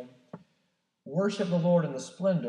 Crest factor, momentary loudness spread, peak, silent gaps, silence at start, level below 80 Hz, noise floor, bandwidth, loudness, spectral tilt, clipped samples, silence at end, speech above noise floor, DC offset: 16 dB; 10 LU; -14 dBFS; none; 0 s; -88 dBFS; -76 dBFS; 10 kHz; -29 LUFS; -7 dB/octave; under 0.1%; 0 s; 49 dB; under 0.1%